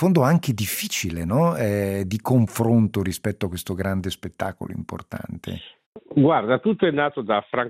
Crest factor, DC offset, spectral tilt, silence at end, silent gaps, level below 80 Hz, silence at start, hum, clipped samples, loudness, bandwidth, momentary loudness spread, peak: 16 dB; under 0.1%; -6 dB/octave; 0 s; 5.86-5.92 s; -54 dBFS; 0 s; none; under 0.1%; -22 LUFS; 16 kHz; 15 LU; -6 dBFS